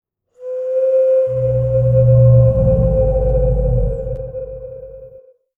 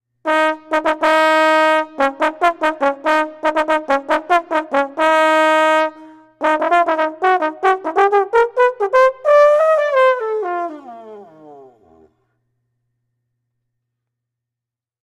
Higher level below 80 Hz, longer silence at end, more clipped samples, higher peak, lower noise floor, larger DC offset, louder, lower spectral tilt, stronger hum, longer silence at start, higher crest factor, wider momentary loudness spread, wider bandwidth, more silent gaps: first, -24 dBFS vs -58 dBFS; second, 0.5 s vs 3.55 s; neither; about the same, -2 dBFS vs -2 dBFS; second, -44 dBFS vs -86 dBFS; neither; about the same, -15 LUFS vs -15 LUFS; first, -12.5 dB/octave vs -2.5 dB/octave; neither; first, 0.4 s vs 0.25 s; about the same, 14 dB vs 14 dB; first, 20 LU vs 7 LU; second, 2.6 kHz vs 13.5 kHz; neither